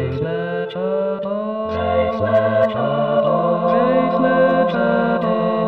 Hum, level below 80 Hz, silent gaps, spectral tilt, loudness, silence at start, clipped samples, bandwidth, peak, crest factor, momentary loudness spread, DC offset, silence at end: none; -48 dBFS; none; -9 dB/octave; -18 LUFS; 0 s; under 0.1%; 5.6 kHz; -4 dBFS; 12 dB; 7 LU; 0.2%; 0 s